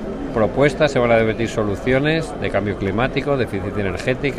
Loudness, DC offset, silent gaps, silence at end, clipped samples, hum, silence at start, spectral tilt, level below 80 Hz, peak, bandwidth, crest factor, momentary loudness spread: -19 LUFS; under 0.1%; none; 0 s; under 0.1%; none; 0 s; -6.5 dB/octave; -36 dBFS; -2 dBFS; 12.5 kHz; 16 dB; 6 LU